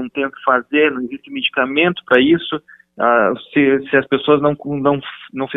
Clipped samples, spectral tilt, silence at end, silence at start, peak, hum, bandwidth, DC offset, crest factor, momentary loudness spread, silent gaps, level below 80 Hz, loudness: under 0.1%; -8 dB/octave; 0 s; 0 s; 0 dBFS; none; 4 kHz; under 0.1%; 16 dB; 12 LU; none; -56 dBFS; -16 LUFS